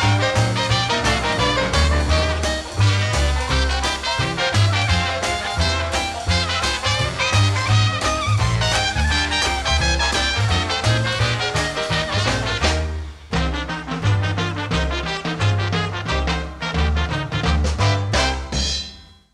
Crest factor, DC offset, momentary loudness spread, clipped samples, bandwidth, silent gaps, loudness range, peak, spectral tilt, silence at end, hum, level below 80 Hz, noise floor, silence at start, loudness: 16 dB; under 0.1%; 5 LU; under 0.1%; 12.5 kHz; none; 4 LU; -4 dBFS; -4 dB/octave; 0.3 s; none; -26 dBFS; -40 dBFS; 0 s; -20 LUFS